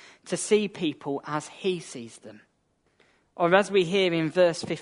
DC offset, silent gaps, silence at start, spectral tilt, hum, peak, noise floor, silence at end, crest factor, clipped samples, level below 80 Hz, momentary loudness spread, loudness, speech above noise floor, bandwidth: under 0.1%; none; 0.25 s; -4.5 dB/octave; none; -4 dBFS; -70 dBFS; 0 s; 22 dB; under 0.1%; -72 dBFS; 12 LU; -25 LUFS; 45 dB; 11 kHz